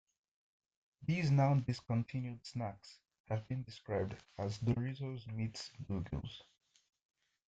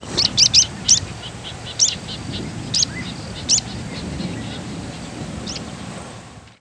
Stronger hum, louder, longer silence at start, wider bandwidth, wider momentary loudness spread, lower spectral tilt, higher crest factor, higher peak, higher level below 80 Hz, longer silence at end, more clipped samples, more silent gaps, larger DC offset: neither; second, -39 LUFS vs -18 LUFS; first, 1 s vs 0 s; second, 8 kHz vs 11 kHz; second, 13 LU vs 18 LU; first, -7.5 dB/octave vs -1.5 dB/octave; about the same, 20 dB vs 20 dB; second, -20 dBFS vs -2 dBFS; second, -64 dBFS vs -42 dBFS; first, 1.05 s vs 0.05 s; neither; first, 3.20-3.24 s vs none; neither